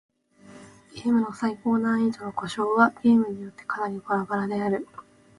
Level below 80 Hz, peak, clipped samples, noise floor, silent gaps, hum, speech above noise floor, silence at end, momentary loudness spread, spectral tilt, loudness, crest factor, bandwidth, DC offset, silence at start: -66 dBFS; -6 dBFS; under 0.1%; -50 dBFS; none; none; 26 dB; 0.35 s; 11 LU; -6.5 dB/octave; -25 LUFS; 20 dB; 11 kHz; under 0.1%; 0.45 s